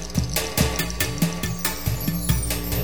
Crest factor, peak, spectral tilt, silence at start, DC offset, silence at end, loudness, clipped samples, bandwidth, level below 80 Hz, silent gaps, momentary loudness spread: 20 dB; -6 dBFS; -4 dB/octave; 0 s; 1%; 0 s; -24 LUFS; under 0.1%; over 20 kHz; -32 dBFS; none; 3 LU